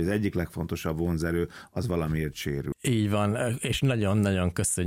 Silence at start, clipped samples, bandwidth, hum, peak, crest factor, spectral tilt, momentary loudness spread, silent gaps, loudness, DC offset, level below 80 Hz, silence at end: 0 s; under 0.1%; 16.5 kHz; none; -14 dBFS; 12 dB; -5.5 dB/octave; 7 LU; none; -28 LUFS; under 0.1%; -44 dBFS; 0 s